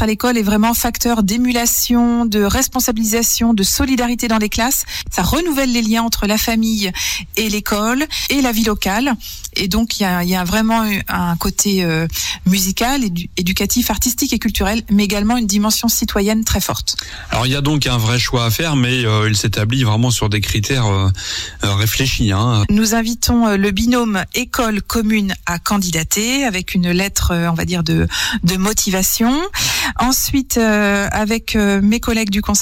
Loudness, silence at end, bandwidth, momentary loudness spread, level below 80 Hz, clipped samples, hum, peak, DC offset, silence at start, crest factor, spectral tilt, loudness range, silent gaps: -16 LUFS; 0 s; 17 kHz; 4 LU; -30 dBFS; under 0.1%; none; -4 dBFS; under 0.1%; 0 s; 12 dB; -4 dB/octave; 2 LU; none